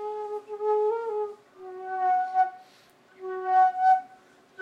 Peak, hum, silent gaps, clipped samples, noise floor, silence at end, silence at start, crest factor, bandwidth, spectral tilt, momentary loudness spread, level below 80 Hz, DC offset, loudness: -12 dBFS; none; none; under 0.1%; -58 dBFS; 0 s; 0 s; 16 dB; 6.6 kHz; -4 dB/octave; 17 LU; -86 dBFS; under 0.1%; -26 LUFS